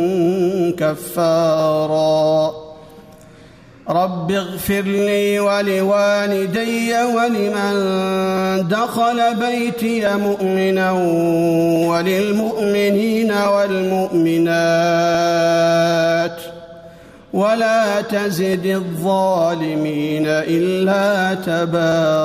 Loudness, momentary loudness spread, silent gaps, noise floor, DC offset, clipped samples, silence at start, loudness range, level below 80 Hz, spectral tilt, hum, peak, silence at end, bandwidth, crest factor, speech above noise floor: -17 LUFS; 5 LU; none; -43 dBFS; under 0.1%; under 0.1%; 0 s; 3 LU; -54 dBFS; -5.5 dB/octave; none; -6 dBFS; 0 s; 15.5 kHz; 10 dB; 26 dB